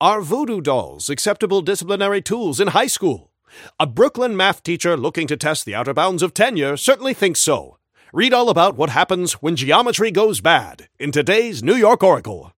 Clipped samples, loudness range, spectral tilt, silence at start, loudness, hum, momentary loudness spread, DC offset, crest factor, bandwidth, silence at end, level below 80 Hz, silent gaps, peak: under 0.1%; 3 LU; -3.5 dB/octave; 0 s; -17 LUFS; none; 7 LU; under 0.1%; 18 dB; 17 kHz; 0.1 s; -58 dBFS; none; 0 dBFS